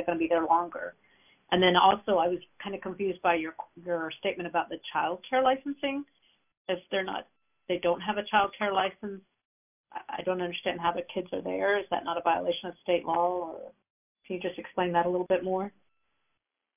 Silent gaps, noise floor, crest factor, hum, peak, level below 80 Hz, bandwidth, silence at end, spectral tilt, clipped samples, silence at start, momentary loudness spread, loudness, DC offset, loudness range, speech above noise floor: 6.57-6.65 s, 9.45-9.84 s, 13.90-14.15 s; -81 dBFS; 22 dB; none; -8 dBFS; -66 dBFS; 3.7 kHz; 1.1 s; -2.5 dB/octave; under 0.1%; 0 s; 14 LU; -29 LUFS; under 0.1%; 5 LU; 52 dB